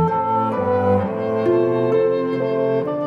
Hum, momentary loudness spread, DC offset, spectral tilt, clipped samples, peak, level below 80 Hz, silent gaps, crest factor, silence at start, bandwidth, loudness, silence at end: none; 3 LU; under 0.1%; -9.5 dB/octave; under 0.1%; -6 dBFS; -56 dBFS; none; 12 dB; 0 s; 6 kHz; -19 LUFS; 0 s